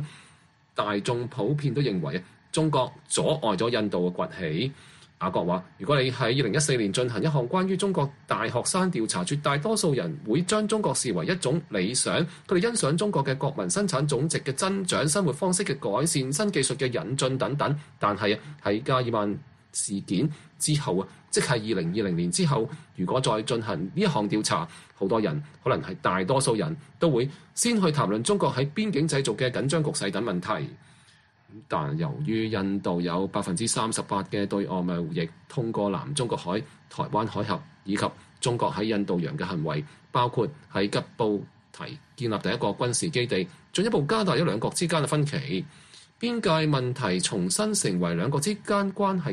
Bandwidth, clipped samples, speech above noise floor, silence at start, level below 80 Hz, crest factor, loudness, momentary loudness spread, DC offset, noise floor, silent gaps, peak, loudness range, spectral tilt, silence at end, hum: 12 kHz; under 0.1%; 32 dB; 0 s; -60 dBFS; 18 dB; -27 LUFS; 7 LU; under 0.1%; -59 dBFS; none; -10 dBFS; 4 LU; -4.5 dB/octave; 0 s; none